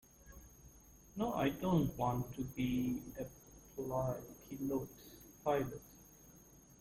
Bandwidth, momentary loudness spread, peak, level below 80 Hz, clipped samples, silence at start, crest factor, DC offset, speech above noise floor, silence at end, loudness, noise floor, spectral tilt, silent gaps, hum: 16.5 kHz; 24 LU; -22 dBFS; -60 dBFS; under 0.1%; 0.25 s; 18 dB; under 0.1%; 24 dB; 0.05 s; -39 LUFS; -62 dBFS; -7 dB/octave; none; none